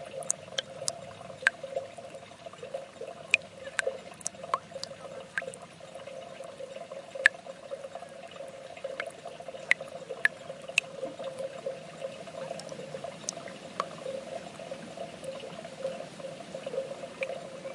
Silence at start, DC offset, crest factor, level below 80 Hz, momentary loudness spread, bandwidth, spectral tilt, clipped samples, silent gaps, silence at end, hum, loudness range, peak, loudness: 0 s; under 0.1%; 34 dB; -76 dBFS; 15 LU; 11.5 kHz; -1.5 dB/octave; under 0.1%; none; 0 s; none; 7 LU; -2 dBFS; -35 LUFS